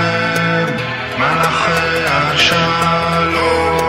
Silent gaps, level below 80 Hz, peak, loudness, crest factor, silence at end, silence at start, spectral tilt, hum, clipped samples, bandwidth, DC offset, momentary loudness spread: none; -38 dBFS; 0 dBFS; -14 LUFS; 14 dB; 0 s; 0 s; -4.5 dB/octave; none; under 0.1%; 16 kHz; 0.2%; 5 LU